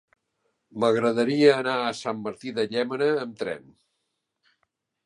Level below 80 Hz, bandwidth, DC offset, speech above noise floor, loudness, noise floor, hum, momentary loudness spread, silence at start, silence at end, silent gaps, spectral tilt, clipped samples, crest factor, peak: -72 dBFS; 11 kHz; under 0.1%; 55 dB; -24 LUFS; -79 dBFS; none; 14 LU; 0.75 s; 1.45 s; none; -5.5 dB/octave; under 0.1%; 22 dB; -4 dBFS